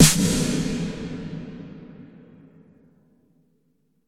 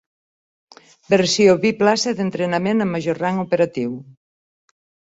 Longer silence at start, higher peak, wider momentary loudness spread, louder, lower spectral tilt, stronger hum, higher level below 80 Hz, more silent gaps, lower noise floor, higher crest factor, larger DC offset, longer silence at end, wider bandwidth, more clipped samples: second, 0 s vs 1.1 s; about the same, 0 dBFS vs -2 dBFS; first, 24 LU vs 8 LU; second, -24 LUFS vs -18 LUFS; about the same, -4 dB/octave vs -5 dB/octave; neither; first, -42 dBFS vs -60 dBFS; neither; second, -68 dBFS vs under -90 dBFS; first, 24 dB vs 18 dB; neither; first, 2 s vs 0.95 s; first, 17 kHz vs 8.2 kHz; neither